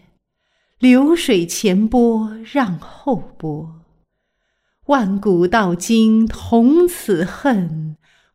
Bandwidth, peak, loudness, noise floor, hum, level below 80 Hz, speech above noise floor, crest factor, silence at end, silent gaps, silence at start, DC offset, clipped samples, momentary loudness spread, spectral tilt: 15.5 kHz; -2 dBFS; -16 LUFS; -71 dBFS; none; -44 dBFS; 55 dB; 14 dB; 0.4 s; none; 0.8 s; under 0.1%; under 0.1%; 14 LU; -5.5 dB/octave